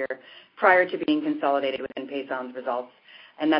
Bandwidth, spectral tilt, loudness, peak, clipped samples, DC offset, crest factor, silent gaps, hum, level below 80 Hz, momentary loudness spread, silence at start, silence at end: 5.6 kHz; -8.5 dB/octave; -25 LUFS; -4 dBFS; under 0.1%; under 0.1%; 20 dB; none; none; -72 dBFS; 14 LU; 0 s; 0 s